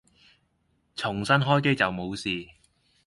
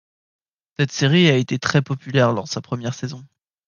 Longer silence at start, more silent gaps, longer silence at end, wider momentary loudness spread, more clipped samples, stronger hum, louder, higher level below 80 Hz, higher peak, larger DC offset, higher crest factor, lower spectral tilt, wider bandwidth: first, 0.95 s vs 0.8 s; neither; first, 0.6 s vs 0.45 s; second, 12 LU vs 16 LU; neither; neither; second, -25 LUFS vs -19 LUFS; about the same, -58 dBFS vs -60 dBFS; second, -8 dBFS vs -2 dBFS; neither; about the same, 20 dB vs 18 dB; about the same, -5.5 dB/octave vs -5.5 dB/octave; first, 11.5 kHz vs 7.2 kHz